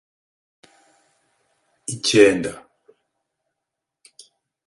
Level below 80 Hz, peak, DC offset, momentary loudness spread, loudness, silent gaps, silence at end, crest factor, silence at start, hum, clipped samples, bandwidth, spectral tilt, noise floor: -60 dBFS; 0 dBFS; under 0.1%; 20 LU; -18 LUFS; none; 2.05 s; 24 dB; 1.9 s; none; under 0.1%; 11.5 kHz; -3.5 dB/octave; -83 dBFS